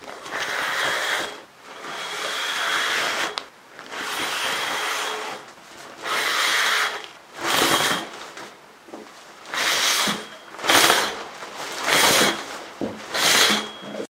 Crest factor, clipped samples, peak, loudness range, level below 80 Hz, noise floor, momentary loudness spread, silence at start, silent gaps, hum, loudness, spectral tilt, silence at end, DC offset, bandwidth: 24 dB; under 0.1%; 0 dBFS; 6 LU; -64 dBFS; -44 dBFS; 24 LU; 0 s; none; none; -21 LUFS; -0.5 dB/octave; 0.05 s; under 0.1%; 16 kHz